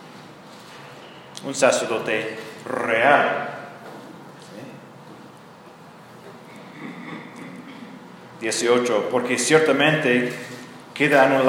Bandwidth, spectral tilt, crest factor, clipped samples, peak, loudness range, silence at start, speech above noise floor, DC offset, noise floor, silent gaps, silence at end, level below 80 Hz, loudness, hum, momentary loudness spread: 17 kHz; -3.5 dB/octave; 22 dB; under 0.1%; -2 dBFS; 19 LU; 0 s; 25 dB; under 0.1%; -45 dBFS; none; 0 s; -74 dBFS; -20 LUFS; none; 26 LU